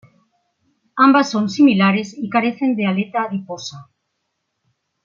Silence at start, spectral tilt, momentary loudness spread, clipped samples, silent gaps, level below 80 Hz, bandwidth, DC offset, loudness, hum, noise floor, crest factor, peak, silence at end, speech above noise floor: 0.95 s; -6 dB/octave; 17 LU; under 0.1%; none; -68 dBFS; 7.4 kHz; under 0.1%; -17 LUFS; none; -74 dBFS; 16 dB; -2 dBFS; 1.2 s; 57 dB